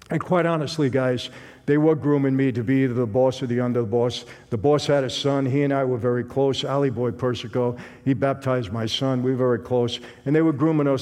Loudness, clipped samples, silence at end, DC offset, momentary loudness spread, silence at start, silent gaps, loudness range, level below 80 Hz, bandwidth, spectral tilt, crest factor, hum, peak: -22 LUFS; under 0.1%; 0 s; under 0.1%; 6 LU; 0.1 s; none; 2 LU; -58 dBFS; 12 kHz; -7 dB/octave; 14 dB; none; -6 dBFS